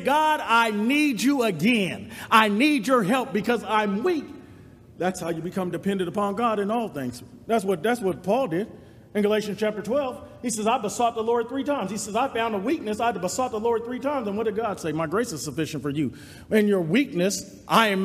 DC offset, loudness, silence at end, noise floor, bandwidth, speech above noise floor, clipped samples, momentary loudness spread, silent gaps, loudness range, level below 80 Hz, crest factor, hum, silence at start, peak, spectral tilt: under 0.1%; -24 LUFS; 0 s; -47 dBFS; 15.5 kHz; 24 dB; under 0.1%; 9 LU; none; 5 LU; -62 dBFS; 22 dB; none; 0 s; -2 dBFS; -4.5 dB/octave